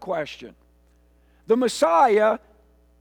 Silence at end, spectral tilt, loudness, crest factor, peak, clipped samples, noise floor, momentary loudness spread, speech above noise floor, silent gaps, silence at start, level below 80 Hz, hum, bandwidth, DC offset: 0.65 s; -4 dB/octave; -20 LUFS; 16 dB; -8 dBFS; under 0.1%; -58 dBFS; 16 LU; 38 dB; none; 0 s; -58 dBFS; 60 Hz at -60 dBFS; 19.5 kHz; under 0.1%